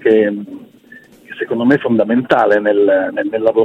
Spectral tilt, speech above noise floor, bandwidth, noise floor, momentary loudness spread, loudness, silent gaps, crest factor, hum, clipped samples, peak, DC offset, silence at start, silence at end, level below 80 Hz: -7.5 dB/octave; 29 dB; 7.4 kHz; -42 dBFS; 14 LU; -14 LUFS; none; 14 dB; none; under 0.1%; 0 dBFS; under 0.1%; 0 s; 0 s; -58 dBFS